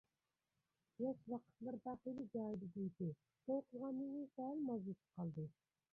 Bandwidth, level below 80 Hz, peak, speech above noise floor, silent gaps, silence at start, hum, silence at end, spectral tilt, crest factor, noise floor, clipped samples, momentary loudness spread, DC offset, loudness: 3.6 kHz; -84 dBFS; -32 dBFS; over 43 dB; none; 1 s; none; 0.4 s; -11.5 dB/octave; 16 dB; under -90 dBFS; under 0.1%; 6 LU; under 0.1%; -48 LUFS